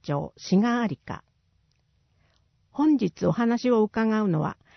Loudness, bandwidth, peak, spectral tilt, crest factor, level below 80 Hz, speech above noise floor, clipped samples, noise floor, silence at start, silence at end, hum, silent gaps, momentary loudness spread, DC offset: -24 LUFS; 6.4 kHz; -10 dBFS; -7.5 dB/octave; 16 dB; -62 dBFS; 44 dB; under 0.1%; -68 dBFS; 0.05 s; 0.25 s; none; none; 14 LU; under 0.1%